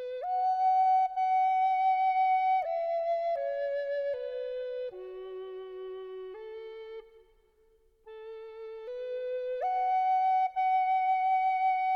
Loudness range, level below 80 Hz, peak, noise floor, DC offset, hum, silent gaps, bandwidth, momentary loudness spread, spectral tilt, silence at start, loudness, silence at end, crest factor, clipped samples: 17 LU; -70 dBFS; -20 dBFS; -66 dBFS; under 0.1%; none; none; 5.8 kHz; 17 LU; -3.5 dB/octave; 0 s; -29 LUFS; 0 s; 10 dB; under 0.1%